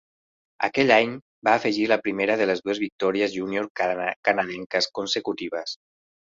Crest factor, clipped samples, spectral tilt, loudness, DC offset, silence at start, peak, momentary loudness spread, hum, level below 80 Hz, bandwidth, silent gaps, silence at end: 22 dB; under 0.1%; -4 dB/octave; -24 LUFS; under 0.1%; 0.6 s; -4 dBFS; 10 LU; none; -66 dBFS; 7.8 kHz; 1.22-1.42 s, 2.92-2.99 s, 3.70-3.75 s, 4.16-4.23 s, 4.66-4.70 s; 0.6 s